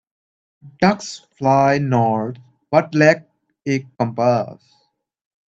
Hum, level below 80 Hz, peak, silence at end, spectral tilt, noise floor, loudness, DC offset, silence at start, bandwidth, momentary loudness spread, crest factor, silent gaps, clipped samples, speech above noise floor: none; -58 dBFS; 0 dBFS; 0.95 s; -6.5 dB/octave; -66 dBFS; -18 LUFS; under 0.1%; 0.65 s; 8 kHz; 12 LU; 20 dB; none; under 0.1%; 48 dB